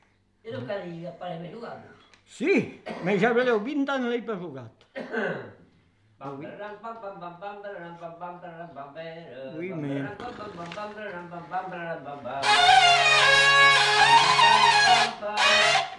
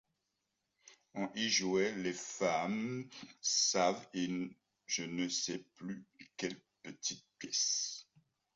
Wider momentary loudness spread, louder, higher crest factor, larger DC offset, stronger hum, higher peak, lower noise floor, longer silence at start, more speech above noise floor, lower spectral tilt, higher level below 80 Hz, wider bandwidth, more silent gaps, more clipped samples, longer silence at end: first, 23 LU vs 17 LU; first, -20 LUFS vs -36 LUFS; about the same, 18 dB vs 20 dB; neither; neither; first, -8 dBFS vs -18 dBFS; second, -62 dBFS vs -86 dBFS; second, 0.45 s vs 0.85 s; second, 37 dB vs 48 dB; about the same, -2.5 dB/octave vs -2.5 dB/octave; first, -62 dBFS vs -80 dBFS; first, 12 kHz vs 8 kHz; neither; neither; second, 0 s vs 0.55 s